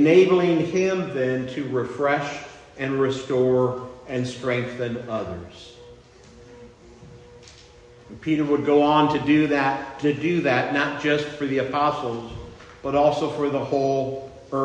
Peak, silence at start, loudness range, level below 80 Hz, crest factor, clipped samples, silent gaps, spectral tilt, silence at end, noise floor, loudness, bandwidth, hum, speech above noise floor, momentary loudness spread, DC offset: -4 dBFS; 0 s; 11 LU; -56 dBFS; 18 dB; under 0.1%; none; -6.5 dB/octave; 0 s; -48 dBFS; -23 LUFS; 9.2 kHz; none; 26 dB; 15 LU; under 0.1%